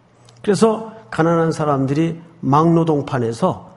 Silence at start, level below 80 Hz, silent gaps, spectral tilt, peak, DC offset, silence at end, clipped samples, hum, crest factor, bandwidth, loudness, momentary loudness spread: 0.45 s; -54 dBFS; none; -7 dB/octave; 0 dBFS; under 0.1%; 0.05 s; under 0.1%; none; 16 dB; 11.5 kHz; -18 LUFS; 11 LU